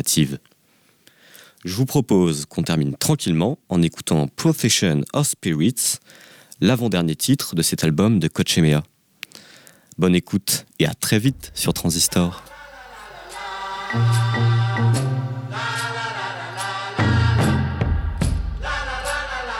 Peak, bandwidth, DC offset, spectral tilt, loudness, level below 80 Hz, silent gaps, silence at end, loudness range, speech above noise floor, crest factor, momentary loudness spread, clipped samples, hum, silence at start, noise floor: -6 dBFS; 19 kHz; under 0.1%; -4.5 dB/octave; -20 LUFS; -36 dBFS; none; 0 s; 3 LU; 39 dB; 14 dB; 12 LU; under 0.1%; none; 0 s; -59 dBFS